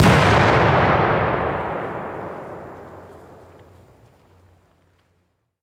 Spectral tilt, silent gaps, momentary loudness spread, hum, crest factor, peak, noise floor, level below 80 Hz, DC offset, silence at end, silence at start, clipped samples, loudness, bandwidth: -6 dB/octave; none; 24 LU; none; 18 dB; -2 dBFS; -67 dBFS; -40 dBFS; under 0.1%; 2.5 s; 0 s; under 0.1%; -18 LUFS; 16 kHz